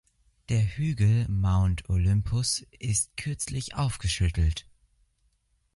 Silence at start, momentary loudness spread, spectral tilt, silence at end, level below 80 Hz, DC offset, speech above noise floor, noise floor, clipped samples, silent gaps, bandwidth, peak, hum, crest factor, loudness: 0.5 s; 7 LU; -4.5 dB/octave; 1.15 s; -36 dBFS; under 0.1%; 45 dB; -70 dBFS; under 0.1%; none; 11.5 kHz; -12 dBFS; none; 14 dB; -27 LUFS